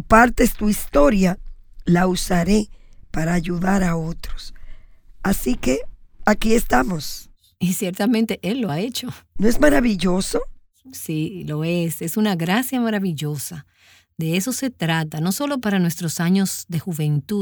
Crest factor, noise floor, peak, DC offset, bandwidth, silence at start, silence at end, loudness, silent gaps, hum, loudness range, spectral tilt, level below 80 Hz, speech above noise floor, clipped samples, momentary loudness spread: 18 dB; -40 dBFS; -2 dBFS; under 0.1%; over 20 kHz; 0 s; 0 s; -21 LUFS; none; none; 3 LU; -5.5 dB/octave; -32 dBFS; 21 dB; under 0.1%; 14 LU